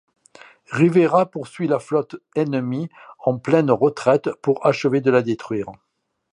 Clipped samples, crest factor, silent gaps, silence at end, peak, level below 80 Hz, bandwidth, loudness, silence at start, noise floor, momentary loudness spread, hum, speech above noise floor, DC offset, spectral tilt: under 0.1%; 18 dB; none; 0.6 s; -2 dBFS; -64 dBFS; 11 kHz; -20 LUFS; 0.7 s; -48 dBFS; 11 LU; none; 29 dB; under 0.1%; -7.5 dB/octave